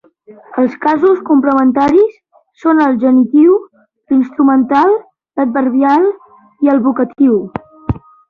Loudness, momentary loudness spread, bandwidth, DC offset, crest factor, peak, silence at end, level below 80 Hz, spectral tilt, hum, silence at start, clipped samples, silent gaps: -12 LUFS; 12 LU; 5.8 kHz; under 0.1%; 10 dB; -2 dBFS; 0.3 s; -42 dBFS; -8.5 dB/octave; none; 0.3 s; under 0.1%; none